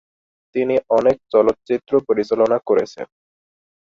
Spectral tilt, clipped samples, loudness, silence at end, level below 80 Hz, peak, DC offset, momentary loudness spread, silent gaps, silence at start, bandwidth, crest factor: -7 dB/octave; under 0.1%; -18 LUFS; 0.75 s; -58 dBFS; -2 dBFS; under 0.1%; 11 LU; none; 0.55 s; 7.4 kHz; 18 dB